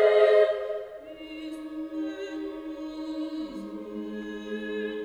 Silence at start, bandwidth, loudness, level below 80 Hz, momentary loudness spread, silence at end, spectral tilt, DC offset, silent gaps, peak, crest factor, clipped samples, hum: 0 s; 9.4 kHz; -29 LUFS; -64 dBFS; 17 LU; 0 s; -5.5 dB/octave; under 0.1%; none; -8 dBFS; 20 dB; under 0.1%; none